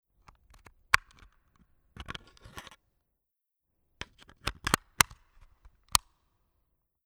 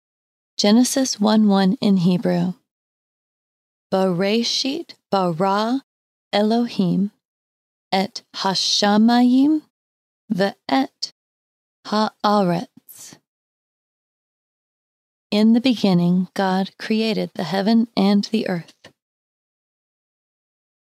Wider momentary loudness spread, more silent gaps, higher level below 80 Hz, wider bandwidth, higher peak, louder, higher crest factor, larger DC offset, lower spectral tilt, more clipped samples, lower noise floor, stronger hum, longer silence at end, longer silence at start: first, 21 LU vs 11 LU; second, none vs 2.71-3.90 s, 5.84-6.31 s, 7.25-7.91 s, 9.70-10.28 s, 11.12-11.83 s, 13.28-15.30 s; first, -52 dBFS vs -76 dBFS; first, over 20 kHz vs 15 kHz; first, 0 dBFS vs -4 dBFS; second, -29 LUFS vs -19 LUFS; first, 36 dB vs 16 dB; neither; second, -1 dB/octave vs -5 dB/octave; neither; first, -84 dBFS vs -43 dBFS; neither; second, 1.05 s vs 2 s; first, 0.95 s vs 0.6 s